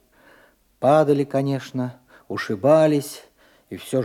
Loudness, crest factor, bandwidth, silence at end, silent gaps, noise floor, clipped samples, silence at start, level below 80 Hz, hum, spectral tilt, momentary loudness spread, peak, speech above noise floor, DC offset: -20 LUFS; 18 dB; 15.5 kHz; 0 s; none; -56 dBFS; under 0.1%; 0.8 s; -68 dBFS; none; -6.5 dB/octave; 19 LU; -4 dBFS; 36 dB; under 0.1%